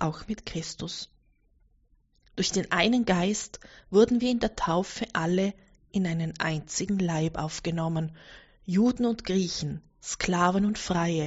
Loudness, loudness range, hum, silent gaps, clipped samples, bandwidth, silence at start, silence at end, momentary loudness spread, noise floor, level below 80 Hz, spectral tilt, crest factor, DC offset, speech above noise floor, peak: -28 LUFS; 4 LU; none; none; under 0.1%; 8 kHz; 0 s; 0 s; 13 LU; -65 dBFS; -52 dBFS; -5 dB/octave; 20 dB; under 0.1%; 38 dB; -8 dBFS